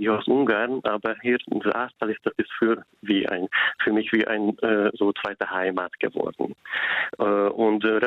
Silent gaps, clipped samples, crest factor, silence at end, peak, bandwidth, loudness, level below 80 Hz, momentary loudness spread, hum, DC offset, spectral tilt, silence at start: none; under 0.1%; 14 dB; 0 s; -10 dBFS; 5 kHz; -24 LUFS; -66 dBFS; 6 LU; none; under 0.1%; -7.5 dB/octave; 0 s